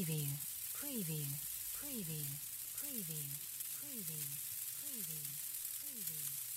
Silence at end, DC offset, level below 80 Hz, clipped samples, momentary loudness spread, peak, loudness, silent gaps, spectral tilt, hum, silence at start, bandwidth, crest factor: 0 s; under 0.1%; -76 dBFS; under 0.1%; 2 LU; -24 dBFS; -41 LUFS; none; -3 dB/octave; none; 0 s; 16 kHz; 20 dB